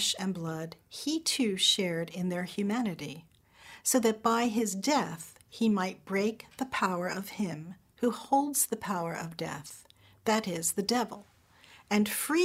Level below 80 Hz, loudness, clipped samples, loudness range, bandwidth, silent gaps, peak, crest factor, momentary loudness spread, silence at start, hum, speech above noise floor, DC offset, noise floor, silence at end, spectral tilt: -70 dBFS; -30 LUFS; under 0.1%; 3 LU; 16 kHz; none; -12 dBFS; 18 dB; 14 LU; 0 s; none; 28 dB; under 0.1%; -58 dBFS; 0 s; -3.5 dB/octave